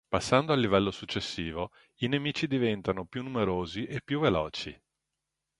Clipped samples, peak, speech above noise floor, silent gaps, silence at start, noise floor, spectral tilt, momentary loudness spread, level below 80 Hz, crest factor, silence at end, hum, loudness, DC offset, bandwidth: under 0.1%; -8 dBFS; 56 dB; none; 0.1 s; -86 dBFS; -5.5 dB/octave; 10 LU; -54 dBFS; 24 dB; 0.85 s; none; -30 LUFS; under 0.1%; 11.5 kHz